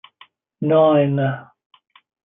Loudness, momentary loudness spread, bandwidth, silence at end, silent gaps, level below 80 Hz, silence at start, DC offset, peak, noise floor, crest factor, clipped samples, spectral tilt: -17 LUFS; 12 LU; 3.8 kHz; 0.8 s; none; -70 dBFS; 0.6 s; under 0.1%; -4 dBFS; -52 dBFS; 16 dB; under 0.1%; -12 dB/octave